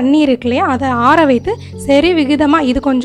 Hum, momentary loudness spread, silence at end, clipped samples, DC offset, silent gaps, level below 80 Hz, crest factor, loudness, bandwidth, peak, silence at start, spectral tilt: none; 5 LU; 0 s; under 0.1%; under 0.1%; none; -36 dBFS; 12 dB; -12 LUFS; 12 kHz; 0 dBFS; 0 s; -6 dB/octave